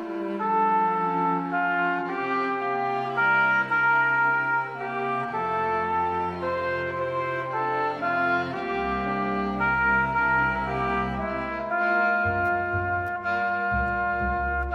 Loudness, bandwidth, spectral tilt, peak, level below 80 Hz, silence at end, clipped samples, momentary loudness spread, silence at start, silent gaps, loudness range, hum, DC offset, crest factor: -25 LUFS; 9.2 kHz; -7 dB/octave; -12 dBFS; -44 dBFS; 0 s; under 0.1%; 7 LU; 0 s; none; 3 LU; none; under 0.1%; 14 dB